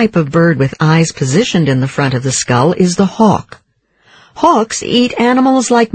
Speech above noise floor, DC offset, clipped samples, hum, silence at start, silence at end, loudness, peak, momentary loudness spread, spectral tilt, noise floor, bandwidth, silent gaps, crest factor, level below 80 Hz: 41 dB; under 0.1%; 0.1%; none; 0 s; 0.1 s; -12 LUFS; 0 dBFS; 3 LU; -5.5 dB/octave; -53 dBFS; 9.4 kHz; none; 12 dB; -46 dBFS